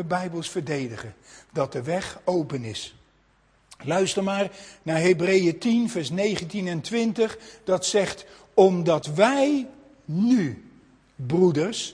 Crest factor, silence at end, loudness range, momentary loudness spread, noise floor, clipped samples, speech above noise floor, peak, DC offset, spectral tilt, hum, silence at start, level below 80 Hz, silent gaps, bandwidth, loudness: 20 dB; 0 s; 7 LU; 15 LU; -62 dBFS; under 0.1%; 38 dB; -4 dBFS; under 0.1%; -5 dB/octave; none; 0 s; -62 dBFS; none; 10.5 kHz; -24 LUFS